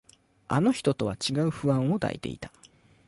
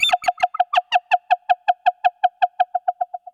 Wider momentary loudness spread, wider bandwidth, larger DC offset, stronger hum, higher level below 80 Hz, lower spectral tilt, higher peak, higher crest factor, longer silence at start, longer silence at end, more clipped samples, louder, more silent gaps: first, 13 LU vs 4 LU; second, 11.5 kHz vs 15 kHz; neither; neither; first, -56 dBFS vs -70 dBFS; first, -6 dB/octave vs 1 dB/octave; second, -12 dBFS vs -4 dBFS; about the same, 16 dB vs 16 dB; first, 0.5 s vs 0 s; first, 0.6 s vs 0.15 s; neither; second, -27 LUFS vs -20 LUFS; neither